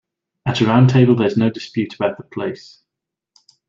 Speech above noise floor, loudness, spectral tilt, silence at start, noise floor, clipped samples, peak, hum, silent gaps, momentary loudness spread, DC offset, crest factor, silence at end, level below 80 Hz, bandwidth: 67 dB; -17 LUFS; -7.5 dB/octave; 0.45 s; -84 dBFS; under 0.1%; -2 dBFS; none; none; 14 LU; under 0.1%; 16 dB; 1.15 s; -54 dBFS; 7.4 kHz